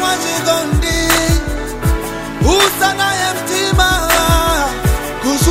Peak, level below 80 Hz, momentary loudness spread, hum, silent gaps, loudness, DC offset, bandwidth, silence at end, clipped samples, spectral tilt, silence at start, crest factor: 0 dBFS; -22 dBFS; 7 LU; none; none; -14 LUFS; under 0.1%; 16.5 kHz; 0 s; under 0.1%; -3.5 dB/octave; 0 s; 14 dB